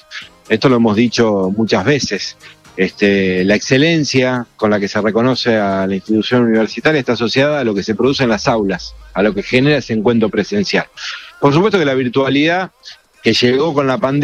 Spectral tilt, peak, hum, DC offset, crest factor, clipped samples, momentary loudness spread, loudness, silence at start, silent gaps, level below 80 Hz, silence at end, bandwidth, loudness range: -5.5 dB/octave; 0 dBFS; none; under 0.1%; 14 dB; under 0.1%; 7 LU; -14 LUFS; 0.1 s; none; -46 dBFS; 0 s; 9.8 kHz; 1 LU